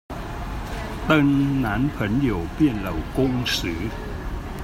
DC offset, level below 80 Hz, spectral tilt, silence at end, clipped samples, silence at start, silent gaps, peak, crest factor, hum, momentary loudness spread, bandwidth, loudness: under 0.1%; -34 dBFS; -6 dB/octave; 0 s; under 0.1%; 0.1 s; none; -6 dBFS; 18 dB; none; 13 LU; 16 kHz; -23 LUFS